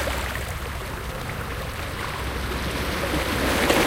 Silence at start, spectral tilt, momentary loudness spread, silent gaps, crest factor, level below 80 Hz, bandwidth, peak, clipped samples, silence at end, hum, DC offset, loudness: 0 s; -4 dB/octave; 9 LU; none; 20 dB; -34 dBFS; 17 kHz; -6 dBFS; under 0.1%; 0 s; none; under 0.1%; -27 LUFS